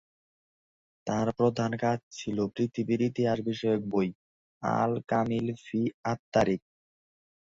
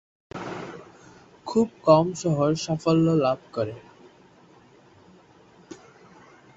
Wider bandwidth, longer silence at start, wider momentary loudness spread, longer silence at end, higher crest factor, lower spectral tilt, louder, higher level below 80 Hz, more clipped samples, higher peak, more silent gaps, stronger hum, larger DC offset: about the same, 7.6 kHz vs 8 kHz; first, 1.05 s vs 0.35 s; second, 7 LU vs 26 LU; first, 0.95 s vs 0.8 s; about the same, 20 dB vs 24 dB; about the same, -7 dB/octave vs -6.5 dB/octave; second, -30 LUFS vs -23 LUFS; about the same, -62 dBFS vs -60 dBFS; neither; second, -10 dBFS vs -4 dBFS; first, 2.03-2.11 s, 4.15-4.61 s, 5.94-6.03 s, 6.19-6.32 s vs none; neither; neither